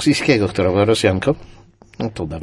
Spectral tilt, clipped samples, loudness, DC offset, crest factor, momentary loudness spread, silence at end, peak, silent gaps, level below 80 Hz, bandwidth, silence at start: -5.5 dB/octave; under 0.1%; -18 LUFS; under 0.1%; 16 dB; 12 LU; 0 s; -2 dBFS; none; -44 dBFS; 11.5 kHz; 0 s